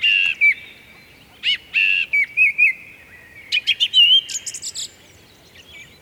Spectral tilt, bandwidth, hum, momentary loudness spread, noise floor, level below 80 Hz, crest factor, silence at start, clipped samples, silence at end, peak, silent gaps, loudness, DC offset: 2.5 dB/octave; 20 kHz; none; 16 LU; -48 dBFS; -62 dBFS; 16 dB; 0 s; under 0.1%; 0.2 s; -4 dBFS; none; -15 LUFS; under 0.1%